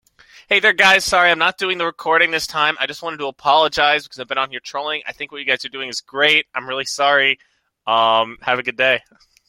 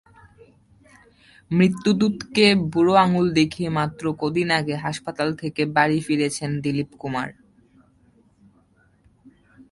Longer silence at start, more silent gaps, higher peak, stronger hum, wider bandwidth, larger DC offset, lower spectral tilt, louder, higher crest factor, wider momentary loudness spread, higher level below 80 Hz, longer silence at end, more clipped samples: second, 0.5 s vs 1.5 s; neither; first, 0 dBFS vs -4 dBFS; neither; first, 16.5 kHz vs 11.5 kHz; neither; second, -1.5 dB/octave vs -5.5 dB/octave; first, -17 LUFS vs -21 LUFS; about the same, 18 dB vs 20 dB; about the same, 12 LU vs 11 LU; about the same, -56 dBFS vs -56 dBFS; about the same, 0.5 s vs 0.45 s; neither